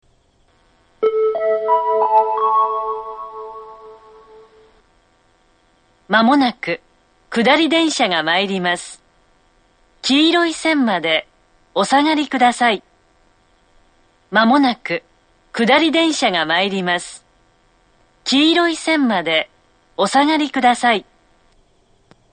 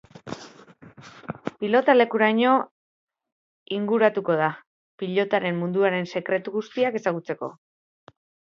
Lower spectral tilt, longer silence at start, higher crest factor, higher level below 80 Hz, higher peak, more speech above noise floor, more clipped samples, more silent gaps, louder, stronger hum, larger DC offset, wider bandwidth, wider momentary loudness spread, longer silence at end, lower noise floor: second, -3.5 dB/octave vs -6.5 dB/octave; first, 1 s vs 0.15 s; about the same, 18 dB vs 22 dB; first, -60 dBFS vs -72 dBFS; first, 0 dBFS vs -4 dBFS; first, 42 dB vs 27 dB; neither; second, none vs 2.71-3.07 s, 3.32-3.66 s, 4.67-4.98 s; first, -16 LUFS vs -23 LUFS; neither; neither; first, 9.4 kHz vs 7.6 kHz; second, 12 LU vs 20 LU; first, 1.3 s vs 0.95 s; first, -57 dBFS vs -49 dBFS